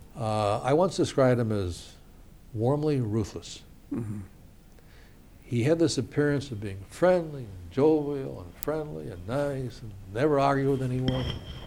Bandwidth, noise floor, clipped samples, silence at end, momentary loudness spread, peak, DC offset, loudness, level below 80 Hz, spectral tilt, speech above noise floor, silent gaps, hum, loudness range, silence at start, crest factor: over 20 kHz; -51 dBFS; under 0.1%; 0 s; 15 LU; -6 dBFS; under 0.1%; -28 LUFS; -48 dBFS; -6.5 dB/octave; 24 dB; none; none; 5 LU; 0 s; 22 dB